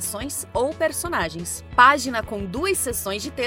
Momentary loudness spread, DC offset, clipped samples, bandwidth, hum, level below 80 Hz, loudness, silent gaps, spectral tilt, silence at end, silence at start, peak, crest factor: 13 LU; under 0.1%; under 0.1%; 17 kHz; none; -44 dBFS; -22 LUFS; none; -3 dB/octave; 0 s; 0 s; 0 dBFS; 22 dB